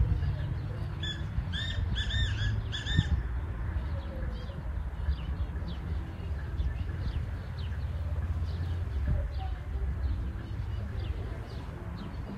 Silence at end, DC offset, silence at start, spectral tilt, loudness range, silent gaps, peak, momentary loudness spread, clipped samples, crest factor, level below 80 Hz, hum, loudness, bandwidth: 0 s; under 0.1%; 0 s; -6 dB/octave; 4 LU; none; -10 dBFS; 7 LU; under 0.1%; 22 dB; -36 dBFS; none; -35 LUFS; 7.8 kHz